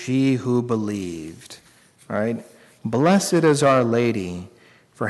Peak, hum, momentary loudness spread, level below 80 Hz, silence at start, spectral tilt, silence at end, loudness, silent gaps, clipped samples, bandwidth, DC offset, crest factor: -8 dBFS; none; 18 LU; -60 dBFS; 0 s; -6 dB/octave; 0 s; -21 LUFS; none; under 0.1%; 12 kHz; under 0.1%; 14 dB